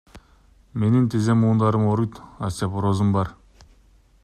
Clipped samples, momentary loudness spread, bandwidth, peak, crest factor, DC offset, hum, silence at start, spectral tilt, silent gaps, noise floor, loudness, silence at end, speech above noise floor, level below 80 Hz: under 0.1%; 12 LU; 12 kHz; -8 dBFS; 16 dB; under 0.1%; none; 0.15 s; -8 dB/octave; none; -55 dBFS; -22 LUFS; 0.9 s; 35 dB; -50 dBFS